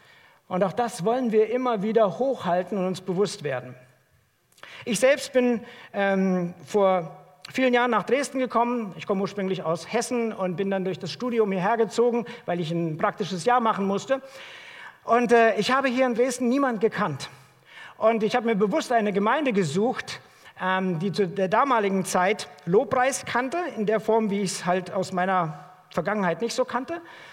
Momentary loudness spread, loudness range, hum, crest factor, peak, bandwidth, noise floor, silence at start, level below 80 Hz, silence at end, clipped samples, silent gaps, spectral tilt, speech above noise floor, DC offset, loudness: 10 LU; 3 LU; none; 18 dB; -6 dBFS; 16 kHz; -65 dBFS; 0.5 s; -70 dBFS; 0 s; under 0.1%; none; -5 dB/octave; 41 dB; under 0.1%; -24 LUFS